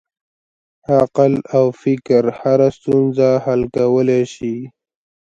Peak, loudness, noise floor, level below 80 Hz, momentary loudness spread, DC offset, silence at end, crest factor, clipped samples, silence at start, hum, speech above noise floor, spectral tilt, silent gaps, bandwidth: 0 dBFS; -16 LUFS; under -90 dBFS; -52 dBFS; 10 LU; under 0.1%; 0.55 s; 16 dB; under 0.1%; 0.9 s; none; over 75 dB; -8 dB/octave; none; 7.8 kHz